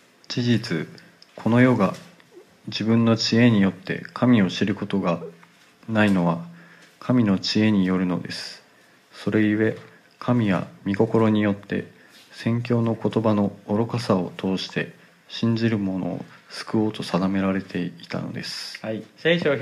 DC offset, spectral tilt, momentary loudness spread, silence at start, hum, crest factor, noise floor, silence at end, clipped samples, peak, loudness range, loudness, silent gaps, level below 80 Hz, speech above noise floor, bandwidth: under 0.1%; -6.5 dB/octave; 13 LU; 0.3 s; none; 18 dB; -55 dBFS; 0 s; under 0.1%; -4 dBFS; 4 LU; -23 LUFS; none; -64 dBFS; 33 dB; 12.5 kHz